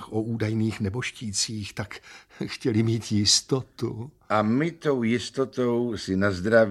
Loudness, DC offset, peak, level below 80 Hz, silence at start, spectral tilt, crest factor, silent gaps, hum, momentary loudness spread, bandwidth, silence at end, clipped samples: -25 LUFS; under 0.1%; -6 dBFS; -58 dBFS; 0 s; -4.5 dB/octave; 18 dB; none; none; 13 LU; 13 kHz; 0 s; under 0.1%